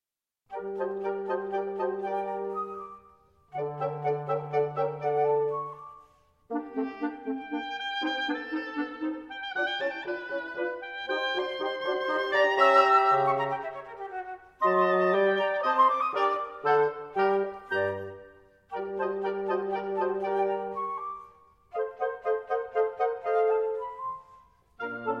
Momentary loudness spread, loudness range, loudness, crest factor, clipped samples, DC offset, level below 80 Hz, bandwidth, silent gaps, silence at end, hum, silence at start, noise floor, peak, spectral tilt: 14 LU; 8 LU; -29 LUFS; 20 dB; under 0.1%; under 0.1%; -72 dBFS; 8.4 kHz; none; 0 s; none; 0.5 s; -78 dBFS; -10 dBFS; -6 dB/octave